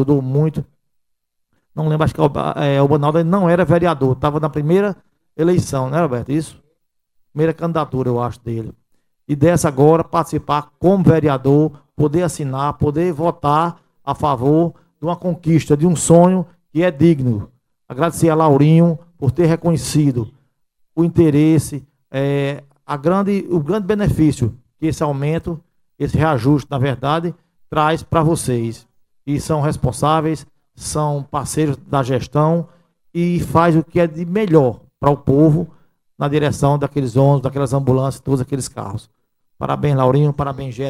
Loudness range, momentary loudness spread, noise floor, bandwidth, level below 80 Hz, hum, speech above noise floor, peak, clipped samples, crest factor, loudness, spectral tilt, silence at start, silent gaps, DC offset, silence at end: 4 LU; 12 LU; -72 dBFS; 14 kHz; -42 dBFS; none; 56 dB; 0 dBFS; under 0.1%; 16 dB; -17 LUFS; -7 dB/octave; 0 s; none; under 0.1%; 0 s